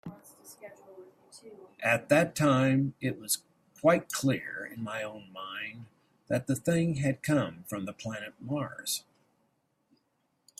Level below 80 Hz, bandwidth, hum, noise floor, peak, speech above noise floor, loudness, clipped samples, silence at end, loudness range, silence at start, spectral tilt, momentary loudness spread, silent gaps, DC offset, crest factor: -68 dBFS; 16 kHz; none; -76 dBFS; -10 dBFS; 45 dB; -30 LUFS; under 0.1%; 1.6 s; 5 LU; 0.05 s; -5 dB/octave; 22 LU; none; under 0.1%; 22 dB